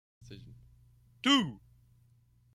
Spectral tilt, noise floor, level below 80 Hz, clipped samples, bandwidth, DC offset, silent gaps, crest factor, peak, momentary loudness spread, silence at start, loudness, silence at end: -3.5 dB/octave; -66 dBFS; -66 dBFS; under 0.1%; 13.5 kHz; under 0.1%; none; 22 dB; -14 dBFS; 25 LU; 0.3 s; -29 LUFS; 1 s